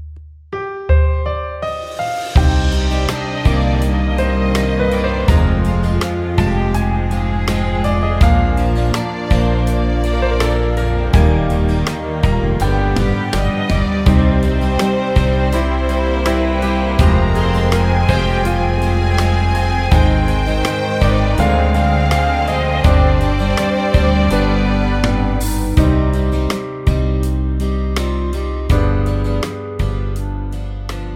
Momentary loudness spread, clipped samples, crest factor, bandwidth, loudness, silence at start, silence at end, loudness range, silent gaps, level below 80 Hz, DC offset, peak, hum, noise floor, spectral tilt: 7 LU; under 0.1%; 14 dB; 15.5 kHz; -16 LUFS; 0 s; 0 s; 3 LU; none; -18 dBFS; under 0.1%; 0 dBFS; none; -35 dBFS; -6.5 dB/octave